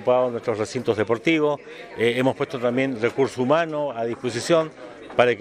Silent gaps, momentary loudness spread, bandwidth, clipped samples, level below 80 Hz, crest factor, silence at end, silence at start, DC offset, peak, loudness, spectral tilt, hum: none; 7 LU; 14 kHz; under 0.1%; -64 dBFS; 22 dB; 0 s; 0 s; under 0.1%; 0 dBFS; -23 LUFS; -5.5 dB/octave; none